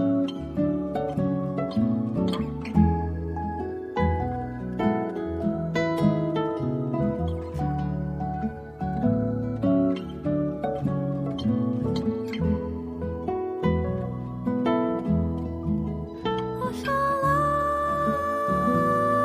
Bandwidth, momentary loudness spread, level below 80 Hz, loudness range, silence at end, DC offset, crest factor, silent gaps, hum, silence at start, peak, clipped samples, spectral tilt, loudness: 15 kHz; 8 LU; -40 dBFS; 2 LU; 0 s; under 0.1%; 18 dB; none; none; 0 s; -8 dBFS; under 0.1%; -8.5 dB/octave; -26 LUFS